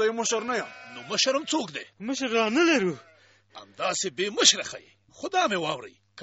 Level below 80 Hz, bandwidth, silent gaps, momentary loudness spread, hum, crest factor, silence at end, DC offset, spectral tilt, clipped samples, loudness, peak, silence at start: -72 dBFS; 8 kHz; none; 19 LU; none; 22 dB; 0 s; under 0.1%; -1 dB/octave; under 0.1%; -25 LUFS; -6 dBFS; 0 s